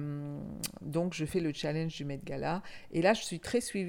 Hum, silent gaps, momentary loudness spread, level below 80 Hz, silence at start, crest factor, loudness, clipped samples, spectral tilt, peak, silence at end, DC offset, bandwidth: none; none; 11 LU; -58 dBFS; 0 s; 20 dB; -34 LUFS; under 0.1%; -5 dB/octave; -14 dBFS; 0 s; under 0.1%; 17.5 kHz